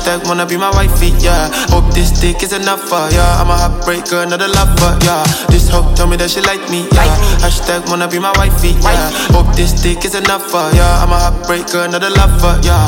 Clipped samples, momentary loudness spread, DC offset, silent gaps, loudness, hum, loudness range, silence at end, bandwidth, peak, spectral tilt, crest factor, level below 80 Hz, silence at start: under 0.1%; 4 LU; under 0.1%; none; -12 LUFS; none; 1 LU; 0 s; 17 kHz; 0 dBFS; -4.5 dB/octave; 10 dB; -12 dBFS; 0 s